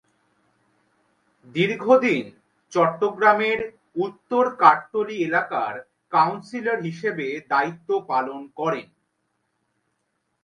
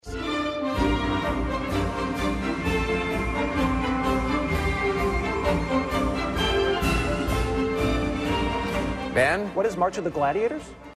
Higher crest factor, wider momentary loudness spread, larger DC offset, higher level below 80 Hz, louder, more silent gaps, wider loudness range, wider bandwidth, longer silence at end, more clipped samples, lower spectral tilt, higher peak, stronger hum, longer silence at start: first, 24 dB vs 14 dB; first, 12 LU vs 4 LU; neither; second, -70 dBFS vs -34 dBFS; first, -22 LUFS vs -25 LUFS; neither; first, 6 LU vs 1 LU; second, 10 kHz vs 14 kHz; first, 1.6 s vs 0 s; neither; about the same, -6 dB/octave vs -5.5 dB/octave; first, 0 dBFS vs -10 dBFS; neither; first, 1.55 s vs 0.05 s